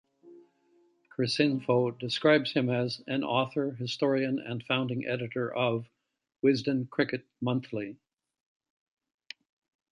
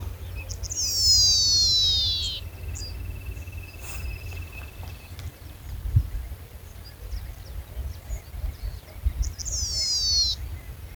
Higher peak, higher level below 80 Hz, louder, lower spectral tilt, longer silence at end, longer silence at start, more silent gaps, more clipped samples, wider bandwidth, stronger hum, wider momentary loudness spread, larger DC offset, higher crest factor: about the same, -10 dBFS vs -8 dBFS; second, -74 dBFS vs -36 dBFS; second, -29 LUFS vs -22 LUFS; first, -6 dB/octave vs -1 dB/octave; first, 2 s vs 0 s; first, 0.25 s vs 0 s; neither; neither; second, 10.5 kHz vs over 20 kHz; neither; second, 12 LU vs 23 LU; neither; about the same, 22 dB vs 18 dB